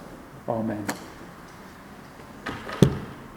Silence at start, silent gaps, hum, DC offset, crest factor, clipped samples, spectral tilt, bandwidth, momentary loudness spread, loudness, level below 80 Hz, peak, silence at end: 0 s; none; none; under 0.1%; 30 dB; under 0.1%; -6.5 dB/octave; over 20 kHz; 22 LU; -28 LUFS; -48 dBFS; 0 dBFS; 0 s